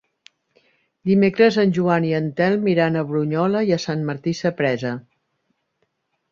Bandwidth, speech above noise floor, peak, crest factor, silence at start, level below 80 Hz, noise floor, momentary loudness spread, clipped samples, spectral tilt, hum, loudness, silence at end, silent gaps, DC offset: 7.4 kHz; 52 dB; -2 dBFS; 18 dB; 1.05 s; -62 dBFS; -71 dBFS; 9 LU; under 0.1%; -7 dB/octave; none; -20 LUFS; 1.3 s; none; under 0.1%